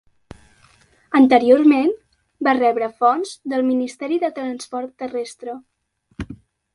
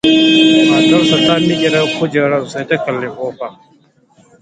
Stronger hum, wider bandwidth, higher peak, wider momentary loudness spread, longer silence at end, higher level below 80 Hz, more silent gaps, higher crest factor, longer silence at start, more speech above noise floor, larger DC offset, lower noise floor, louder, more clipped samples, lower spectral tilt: neither; first, 11.5 kHz vs 9.2 kHz; about the same, 0 dBFS vs 0 dBFS; first, 20 LU vs 14 LU; second, 0.4 s vs 0.9 s; about the same, -52 dBFS vs -52 dBFS; neither; first, 20 dB vs 12 dB; first, 1.1 s vs 0.05 s; about the same, 37 dB vs 35 dB; neither; first, -55 dBFS vs -50 dBFS; second, -18 LUFS vs -12 LUFS; neither; about the same, -5.5 dB/octave vs -5 dB/octave